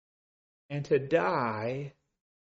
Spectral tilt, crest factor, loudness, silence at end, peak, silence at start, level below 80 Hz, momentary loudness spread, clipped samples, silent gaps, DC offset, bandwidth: -5.5 dB/octave; 20 dB; -30 LUFS; 0.7 s; -14 dBFS; 0.7 s; -70 dBFS; 13 LU; under 0.1%; none; under 0.1%; 7.6 kHz